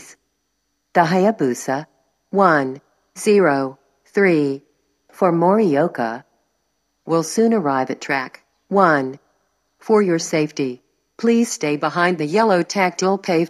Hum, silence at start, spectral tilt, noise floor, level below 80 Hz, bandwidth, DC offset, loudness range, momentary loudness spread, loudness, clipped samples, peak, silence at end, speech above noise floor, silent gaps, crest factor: none; 0.1 s; -5.5 dB/octave; -71 dBFS; -78 dBFS; 13 kHz; under 0.1%; 2 LU; 11 LU; -18 LUFS; under 0.1%; 0 dBFS; 0 s; 54 dB; none; 18 dB